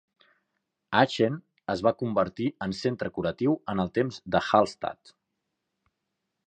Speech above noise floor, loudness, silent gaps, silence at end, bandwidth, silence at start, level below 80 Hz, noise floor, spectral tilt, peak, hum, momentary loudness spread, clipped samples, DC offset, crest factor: 56 dB; -27 LUFS; none; 1.55 s; 9.6 kHz; 0.9 s; -58 dBFS; -82 dBFS; -6.5 dB/octave; -6 dBFS; none; 9 LU; under 0.1%; under 0.1%; 24 dB